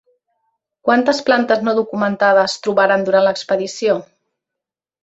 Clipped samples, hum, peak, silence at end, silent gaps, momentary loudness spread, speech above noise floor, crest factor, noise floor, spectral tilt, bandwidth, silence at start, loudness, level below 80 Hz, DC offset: under 0.1%; none; -2 dBFS; 1 s; none; 6 LU; 70 dB; 16 dB; -85 dBFS; -4.5 dB/octave; 8 kHz; 0.85 s; -16 LUFS; -64 dBFS; under 0.1%